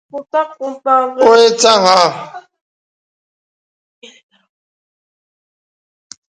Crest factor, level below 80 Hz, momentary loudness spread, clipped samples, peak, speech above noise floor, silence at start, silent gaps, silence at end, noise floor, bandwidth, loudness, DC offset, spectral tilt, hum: 16 dB; -66 dBFS; 14 LU; under 0.1%; 0 dBFS; over 78 dB; 0.15 s; none; 3.95 s; under -90 dBFS; 11 kHz; -11 LUFS; under 0.1%; -2 dB/octave; none